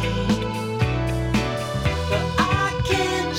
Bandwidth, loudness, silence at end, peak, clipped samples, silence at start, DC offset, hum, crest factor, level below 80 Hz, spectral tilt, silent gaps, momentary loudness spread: 16.5 kHz; -23 LUFS; 0 s; -6 dBFS; under 0.1%; 0 s; under 0.1%; none; 16 dB; -34 dBFS; -5.5 dB/octave; none; 3 LU